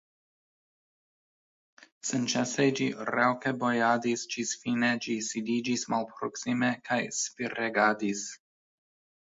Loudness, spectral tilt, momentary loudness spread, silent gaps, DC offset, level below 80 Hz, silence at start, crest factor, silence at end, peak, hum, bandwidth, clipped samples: -29 LUFS; -3.5 dB/octave; 7 LU; none; under 0.1%; -76 dBFS; 2.05 s; 22 dB; 0.9 s; -10 dBFS; none; 8 kHz; under 0.1%